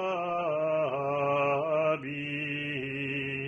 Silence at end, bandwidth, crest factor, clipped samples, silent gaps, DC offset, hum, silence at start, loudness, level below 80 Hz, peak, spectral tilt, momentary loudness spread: 0 s; 7 kHz; 14 dB; under 0.1%; none; under 0.1%; none; 0 s; -30 LUFS; -68 dBFS; -16 dBFS; -7 dB/octave; 5 LU